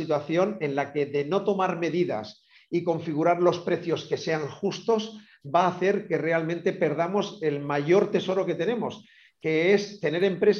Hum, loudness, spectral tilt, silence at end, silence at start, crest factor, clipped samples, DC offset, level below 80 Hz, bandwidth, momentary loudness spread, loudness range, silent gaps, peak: none; -26 LUFS; -6.5 dB/octave; 0 s; 0 s; 18 dB; under 0.1%; under 0.1%; -74 dBFS; 7 kHz; 8 LU; 2 LU; none; -8 dBFS